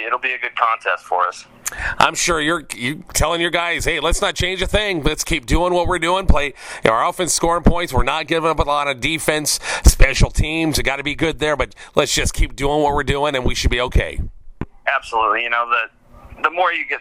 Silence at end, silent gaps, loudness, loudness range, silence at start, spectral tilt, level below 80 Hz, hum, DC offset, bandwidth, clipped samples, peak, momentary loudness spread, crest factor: 0 s; none; -18 LUFS; 2 LU; 0 s; -3.5 dB/octave; -24 dBFS; none; under 0.1%; 16 kHz; under 0.1%; 0 dBFS; 6 LU; 18 dB